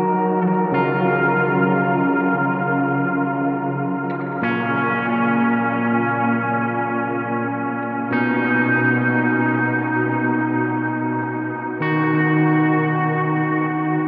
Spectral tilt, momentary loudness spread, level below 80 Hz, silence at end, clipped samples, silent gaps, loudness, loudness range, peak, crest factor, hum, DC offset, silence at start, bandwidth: -10.5 dB/octave; 6 LU; -68 dBFS; 0 s; under 0.1%; none; -19 LUFS; 2 LU; -6 dBFS; 14 dB; none; under 0.1%; 0 s; 4.9 kHz